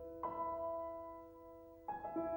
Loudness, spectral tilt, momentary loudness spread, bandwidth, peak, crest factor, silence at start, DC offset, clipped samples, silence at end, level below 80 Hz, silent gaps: -45 LUFS; -9 dB/octave; 15 LU; 19 kHz; -32 dBFS; 14 dB; 0 s; under 0.1%; under 0.1%; 0 s; -68 dBFS; none